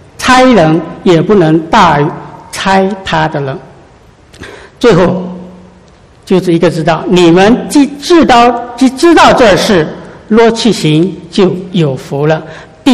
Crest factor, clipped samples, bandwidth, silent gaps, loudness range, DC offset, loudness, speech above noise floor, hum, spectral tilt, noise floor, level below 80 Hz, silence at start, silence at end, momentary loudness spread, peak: 8 dB; 2%; 13.5 kHz; none; 7 LU; under 0.1%; -8 LUFS; 32 dB; none; -5.5 dB/octave; -39 dBFS; -36 dBFS; 0.2 s; 0 s; 13 LU; 0 dBFS